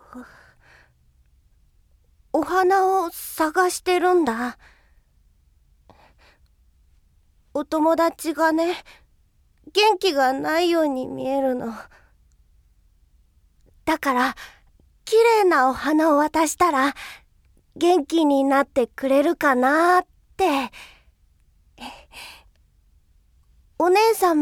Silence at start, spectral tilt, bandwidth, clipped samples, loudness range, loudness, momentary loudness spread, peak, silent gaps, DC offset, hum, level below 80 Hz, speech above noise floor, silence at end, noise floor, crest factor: 0.15 s; -3 dB/octave; 17.5 kHz; under 0.1%; 9 LU; -20 LUFS; 20 LU; -6 dBFS; none; under 0.1%; none; -56 dBFS; 40 dB; 0 s; -60 dBFS; 18 dB